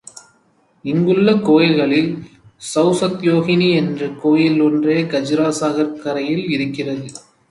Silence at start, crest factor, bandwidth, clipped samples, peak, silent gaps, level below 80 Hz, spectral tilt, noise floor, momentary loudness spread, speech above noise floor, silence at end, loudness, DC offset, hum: 0.85 s; 16 dB; 11.5 kHz; under 0.1%; -2 dBFS; none; -60 dBFS; -6 dB/octave; -58 dBFS; 11 LU; 42 dB; 0.3 s; -16 LUFS; under 0.1%; none